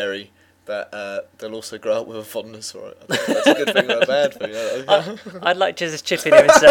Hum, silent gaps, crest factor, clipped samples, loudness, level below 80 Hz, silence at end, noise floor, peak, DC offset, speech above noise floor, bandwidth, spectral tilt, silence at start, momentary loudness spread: none; none; 18 dB; under 0.1%; -18 LUFS; -60 dBFS; 0 s; -41 dBFS; 0 dBFS; under 0.1%; 23 dB; 17.5 kHz; -3 dB/octave; 0 s; 19 LU